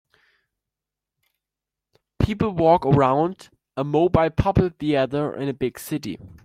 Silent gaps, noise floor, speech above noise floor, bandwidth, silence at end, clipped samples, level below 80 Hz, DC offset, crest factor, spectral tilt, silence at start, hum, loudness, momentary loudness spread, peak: none; -87 dBFS; 66 dB; 16 kHz; 0.15 s; under 0.1%; -42 dBFS; under 0.1%; 20 dB; -7.5 dB/octave; 2.2 s; none; -21 LUFS; 12 LU; -2 dBFS